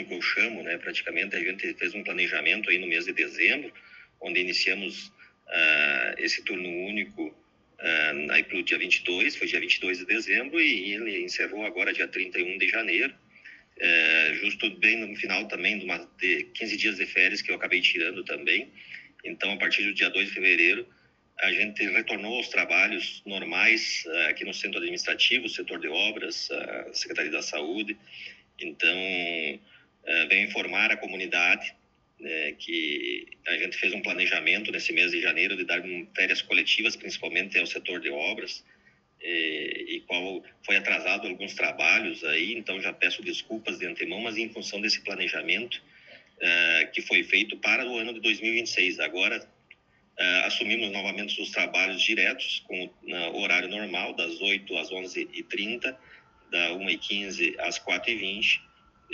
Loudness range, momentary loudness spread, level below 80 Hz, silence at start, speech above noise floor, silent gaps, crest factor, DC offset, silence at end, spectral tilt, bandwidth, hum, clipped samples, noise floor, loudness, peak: 5 LU; 11 LU; -74 dBFS; 0 s; 32 dB; none; 22 dB; under 0.1%; 0 s; -2 dB/octave; 8 kHz; none; under 0.1%; -60 dBFS; -25 LUFS; -6 dBFS